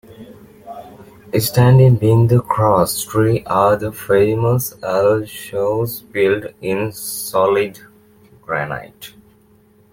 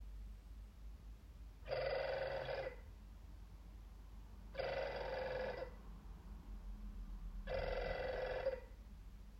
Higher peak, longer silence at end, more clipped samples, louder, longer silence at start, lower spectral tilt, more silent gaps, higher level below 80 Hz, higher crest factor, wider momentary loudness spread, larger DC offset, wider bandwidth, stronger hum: first, 0 dBFS vs -28 dBFS; first, 0.85 s vs 0 s; neither; first, -16 LUFS vs -45 LUFS; about the same, 0.1 s vs 0 s; about the same, -6.5 dB/octave vs -6 dB/octave; neither; about the same, -48 dBFS vs -52 dBFS; about the same, 16 dB vs 18 dB; about the same, 15 LU vs 17 LU; neither; about the same, 17 kHz vs 15.5 kHz; neither